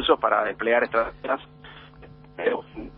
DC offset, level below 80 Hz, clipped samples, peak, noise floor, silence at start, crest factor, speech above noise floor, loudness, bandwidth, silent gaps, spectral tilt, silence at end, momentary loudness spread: under 0.1%; -52 dBFS; under 0.1%; -6 dBFS; -47 dBFS; 0 s; 20 dB; 24 dB; -24 LUFS; 5.2 kHz; none; -1 dB/octave; 0 s; 24 LU